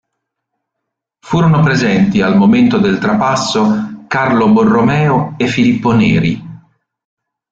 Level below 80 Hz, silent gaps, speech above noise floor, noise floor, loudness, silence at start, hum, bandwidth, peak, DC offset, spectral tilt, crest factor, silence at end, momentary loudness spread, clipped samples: -44 dBFS; none; 66 dB; -77 dBFS; -12 LUFS; 1.25 s; none; 7.8 kHz; -2 dBFS; under 0.1%; -6.5 dB/octave; 12 dB; 0.95 s; 6 LU; under 0.1%